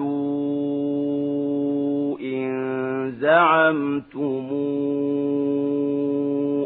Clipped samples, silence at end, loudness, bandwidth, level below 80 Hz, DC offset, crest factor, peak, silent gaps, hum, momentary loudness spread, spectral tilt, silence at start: under 0.1%; 0 s; -23 LUFS; 4.1 kHz; -70 dBFS; under 0.1%; 18 dB; -4 dBFS; none; none; 9 LU; -11 dB/octave; 0 s